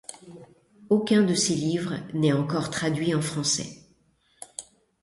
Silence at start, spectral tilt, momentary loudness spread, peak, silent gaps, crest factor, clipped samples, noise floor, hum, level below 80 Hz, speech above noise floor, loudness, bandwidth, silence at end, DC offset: 0.1 s; -4.5 dB/octave; 19 LU; -8 dBFS; none; 18 dB; under 0.1%; -65 dBFS; none; -62 dBFS; 40 dB; -25 LUFS; 11.5 kHz; 0.4 s; under 0.1%